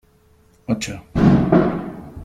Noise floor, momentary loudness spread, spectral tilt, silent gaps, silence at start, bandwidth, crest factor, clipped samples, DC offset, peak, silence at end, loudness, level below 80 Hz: -54 dBFS; 16 LU; -7.5 dB/octave; none; 0.7 s; 12.5 kHz; 18 dB; under 0.1%; under 0.1%; -2 dBFS; 0 s; -18 LUFS; -38 dBFS